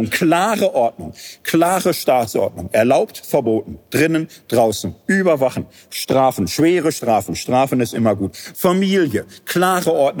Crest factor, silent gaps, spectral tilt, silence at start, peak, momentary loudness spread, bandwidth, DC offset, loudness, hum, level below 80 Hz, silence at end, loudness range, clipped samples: 16 dB; none; -5 dB/octave; 0 s; -2 dBFS; 8 LU; over 20 kHz; under 0.1%; -17 LUFS; none; -52 dBFS; 0 s; 1 LU; under 0.1%